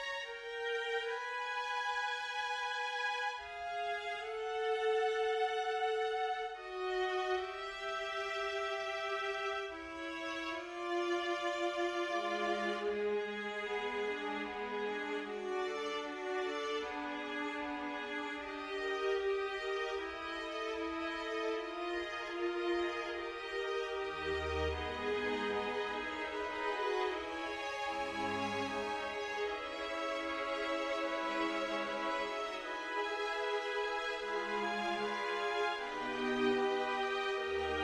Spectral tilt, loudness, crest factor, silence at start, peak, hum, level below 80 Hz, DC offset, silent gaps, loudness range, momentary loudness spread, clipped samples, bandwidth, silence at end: -3.5 dB/octave; -37 LUFS; 16 dB; 0 s; -22 dBFS; none; -62 dBFS; under 0.1%; none; 3 LU; 5 LU; under 0.1%; 12 kHz; 0 s